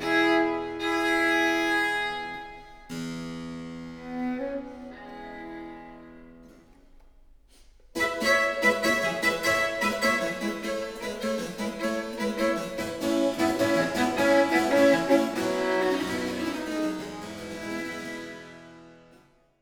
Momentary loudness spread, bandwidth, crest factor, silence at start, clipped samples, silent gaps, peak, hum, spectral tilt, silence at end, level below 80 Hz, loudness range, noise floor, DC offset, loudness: 18 LU; over 20 kHz; 18 dB; 0 s; under 0.1%; none; -8 dBFS; none; -4 dB/octave; 0.65 s; -56 dBFS; 13 LU; -59 dBFS; under 0.1%; -26 LUFS